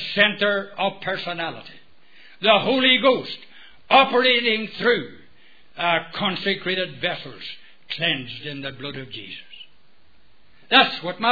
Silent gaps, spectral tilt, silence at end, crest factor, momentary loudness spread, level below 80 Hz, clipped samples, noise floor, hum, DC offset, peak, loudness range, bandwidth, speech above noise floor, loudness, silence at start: none; -6 dB/octave; 0 s; 22 dB; 19 LU; -66 dBFS; under 0.1%; -60 dBFS; none; 0.6%; 0 dBFS; 10 LU; 5 kHz; 39 dB; -20 LUFS; 0 s